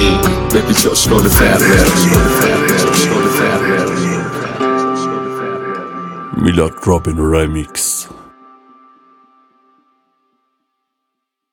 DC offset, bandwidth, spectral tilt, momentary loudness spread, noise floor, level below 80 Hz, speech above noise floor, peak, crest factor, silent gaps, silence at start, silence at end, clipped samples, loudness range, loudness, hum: under 0.1%; 19 kHz; -4.5 dB/octave; 12 LU; -75 dBFS; -26 dBFS; 64 dB; 0 dBFS; 14 dB; none; 0 s; 3.3 s; under 0.1%; 10 LU; -13 LUFS; none